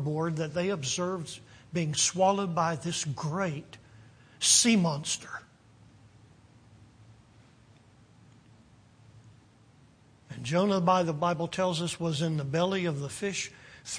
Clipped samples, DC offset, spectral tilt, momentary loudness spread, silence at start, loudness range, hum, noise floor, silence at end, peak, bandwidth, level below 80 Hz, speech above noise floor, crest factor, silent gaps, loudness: under 0.1%; under 0.1%; -3.5 dB/octave; 14 LU; 0 s; 7 LU; none; -59 dBFS; 0 s; -10 dBFS; 10.5 kHz; -66 dBFS; 30 dB; 22 dB; none; -28 LUFS